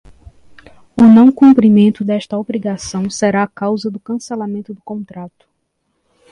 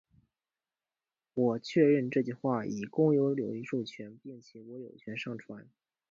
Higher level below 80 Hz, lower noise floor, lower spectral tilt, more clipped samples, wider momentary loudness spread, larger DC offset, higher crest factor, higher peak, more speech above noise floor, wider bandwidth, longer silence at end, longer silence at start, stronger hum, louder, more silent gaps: first, -50 dBFS vs -78 dBFS; second, -68 dBFS vs under -90 dBFS; about the same, -6.5 dB/octave vs -7.5 dB/octave; neither; about the same, 20 LU vs 22 LU; neither; second, 14 dB vs 20 dB; first, 0 dBFS vs -14 dBFS; second, 55 dB vs over 59 dB; first, 10.5 kHz vs 7.4 kHz; first, 1.05 s vs 0.5 s; second, 0.95 s vs 1.35 s; neither; first, -13 LUFS vs -31 LUFS; neither